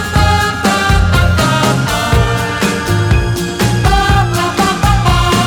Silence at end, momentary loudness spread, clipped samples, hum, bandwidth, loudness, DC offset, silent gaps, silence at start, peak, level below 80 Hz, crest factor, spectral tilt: 0 s; 3 LU; under 0.1%; none; 19 kHz; -12 LUFS; under 0.1%; none; 0 s; 0 dBFS; -18 dBFS; 12 dB; -5 dB/octave